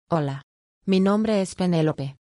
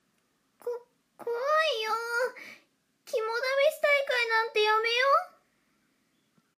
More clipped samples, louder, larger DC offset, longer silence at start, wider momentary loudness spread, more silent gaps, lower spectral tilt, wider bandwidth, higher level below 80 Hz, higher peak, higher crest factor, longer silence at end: neither; first, -23 LUFS vs -27 LUFS; neither; second, 0.1 s vs 0.65 s; second, 11 LU vs 17 LU; first, 0.43-0.81 s vs none; first, -7 dB/octave vs 1 dB/octave; second, 11 kHz vs 15.5 kHz; first, -58 dBFS vs under -90 dBFS; about the same, -10 dBFS vs -12 dBFS; about the same, 14 dB vs 18 dB; second, 0.1 s vs 1.3 s